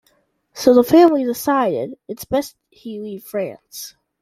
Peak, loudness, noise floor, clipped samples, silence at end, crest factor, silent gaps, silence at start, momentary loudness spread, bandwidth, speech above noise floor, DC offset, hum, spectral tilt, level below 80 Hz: -2 dBFS; -17 LUFS; -63 dBFS; under 0.1%; 0.3 s; 18 dB; none; 0.55 s; 22 LU; 16 kHz; 45 dB; under 0.1%; none; -5 dB/octave; -56 dBFS